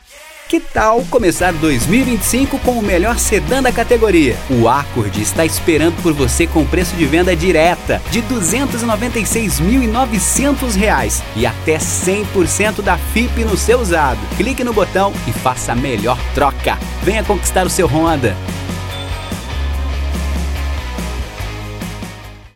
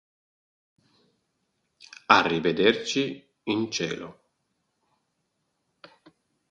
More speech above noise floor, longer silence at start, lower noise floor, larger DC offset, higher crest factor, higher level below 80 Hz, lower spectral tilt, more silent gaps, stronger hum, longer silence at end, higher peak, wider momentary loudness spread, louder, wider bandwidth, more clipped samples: second, 23 dB vs 52 dB; second, 0.1 s vs 2.1 s; second, -37 dBFS vs -77 dBFS; neither; second, 14 dB vs 28 dB; first, -24 dBFS vs -66 dBFS; about the same, -4.5 dB/octave vs -4 dB/octave; neither; neither; second, 0.1 s vs 2.4 s; about the same, 0 dBFS vs 0 dBFS; second, 10 LU vs 18 LU; first, -15 LUFS vs -24 LUFS; first, 17 kHz vs 9.4 kHz; neither